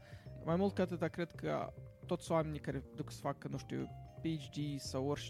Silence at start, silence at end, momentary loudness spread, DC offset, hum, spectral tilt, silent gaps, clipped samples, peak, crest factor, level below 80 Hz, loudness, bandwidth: 0 s; 0 s; 10 LU; under 0.1%; none; -6.5 dB/octave; none; under 0.1%; -22 dBFS; 18 dB; -62 dBFS; -40 LUFS; 15 kHz